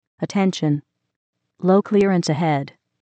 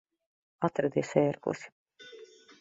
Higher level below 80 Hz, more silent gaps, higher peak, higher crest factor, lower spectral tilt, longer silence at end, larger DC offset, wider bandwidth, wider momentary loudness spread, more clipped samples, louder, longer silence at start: first, -64 dBFS vs -72 dBFS; about the same, 1.16-1.33 s vs 1.72-1.86 s; first, -6 dBFS vs -10 dBFS; second, 14 dB vs 24 dB; about the same, -6.5 dB/octave vs -7 dB/octave; about the same, 0.35 s vs 0.35 s; neither; about the same, 8.8 kHz vs 8 kHz; second, 9 LU vs 22 LU; neither; first, -20 LUFS vs -31 LUFS; second, 0.2 s vs 0.6 s